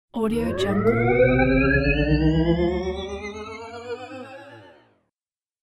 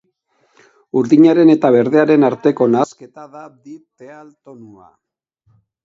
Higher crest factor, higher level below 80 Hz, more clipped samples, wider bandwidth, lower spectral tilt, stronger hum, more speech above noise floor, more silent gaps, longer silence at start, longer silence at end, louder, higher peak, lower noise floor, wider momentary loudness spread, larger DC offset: about the same, 18 dB vs 16 dB; first, -34 dBFS vs -64 dBFS; neither; first, 13 kHz vs 7.6 kHz; about the same, -7.5 dB/octave vs -7.5 dB/octave; neither; first, over 70 dB vs 48 dB; neither; second, 0.15 s vs 0.95 s; second, 1 s vs 1.8 s; second, -21 LUFS vs -13 LUFS; second, -6 dBFS vs 0 dBFS; first, under -90 dBFS vs -62 dBFS; about the same, 18 LU vs 19 LU; neither